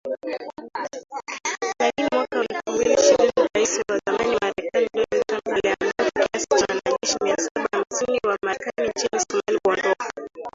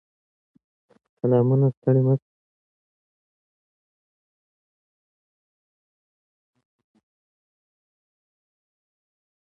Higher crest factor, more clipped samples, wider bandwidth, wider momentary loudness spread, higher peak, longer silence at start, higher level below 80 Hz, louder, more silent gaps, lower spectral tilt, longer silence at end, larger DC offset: about the same, 18 dB vs 20 dB; neither; first, 7.8 kHz vs 3.1 kHz; first, 12 LU vs 7 LU; first, -4 dBFS vs -8 dBFS; second, 0.05 s vs 1.25 s; first, -58 dBFS vs -72 dBFS; about the same, -22 LUFS vs -21 LUFS; about the same, 7.51-7.55 s vs 1.77-1.82 s; second, -2 dB/octave vs -13 dB/octave; second, 0.05 s vs 7.35 s; neither